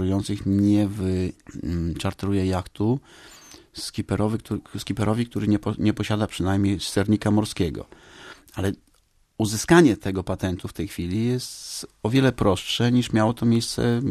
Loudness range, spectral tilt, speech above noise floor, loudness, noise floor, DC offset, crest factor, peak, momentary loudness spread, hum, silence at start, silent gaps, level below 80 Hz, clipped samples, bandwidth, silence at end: 5 LU; -6 dB/octave; 39 dB; -24 LUFS; -62 dBFS; under 0.1%; 22 dB; -2 dBFS; 12 LU; none; 0 s; none; -46 dBFS; under 0.1%; 14 kHz; 0 s